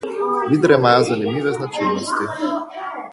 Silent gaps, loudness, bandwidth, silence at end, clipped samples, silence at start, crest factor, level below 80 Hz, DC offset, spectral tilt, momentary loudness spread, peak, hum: none; -18 LUFS; 11.5 kHz; 0 s; under 0.1%; 0 s; 18 dB; -60 dBFS; under 0.1%; -5.5 dB/octave; 11 LU; 0 dBFS; none